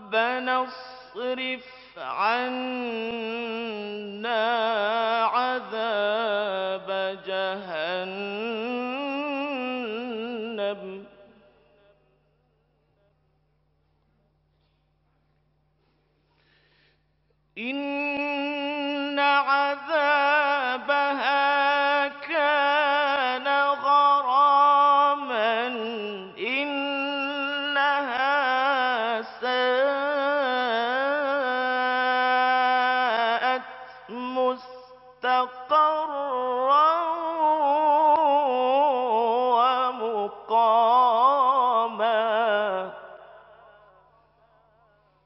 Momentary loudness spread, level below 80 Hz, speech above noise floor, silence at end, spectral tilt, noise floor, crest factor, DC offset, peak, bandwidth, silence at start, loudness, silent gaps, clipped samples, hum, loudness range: 12 LU; -74 dBFS; 41 dB; 1.85 s; 0.5 dB/octave; -68 dBFS; 16 dB; under 0.1%; -8 dBFS; 5.8 kHz; 0 s; -24 LUFS; none; under 0.1%; none; 9 LU